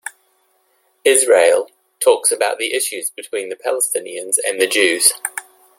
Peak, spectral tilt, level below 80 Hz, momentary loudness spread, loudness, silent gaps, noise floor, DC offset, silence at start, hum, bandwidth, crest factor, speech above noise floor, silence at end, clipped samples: 0 dBFS; 0.5 dB/octave; -70 dBFS; 14 LU; -16 LUFS; none; -61 dBFS; under 0.1%; 0.05 s; none; 16.5 kHz; 18 dB; 45 dB; 0.35 s; under 0.1%